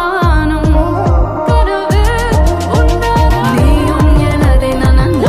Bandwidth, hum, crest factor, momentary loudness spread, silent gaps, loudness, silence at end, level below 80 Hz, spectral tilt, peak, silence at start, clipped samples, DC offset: 15 kHz; none; 10 dB; 2 LU; none; -11 LUFS; 0 s; -12 dBFS; -7 dB/octave; 0 dBFS; 0 s; under 0.1%; under 0.1%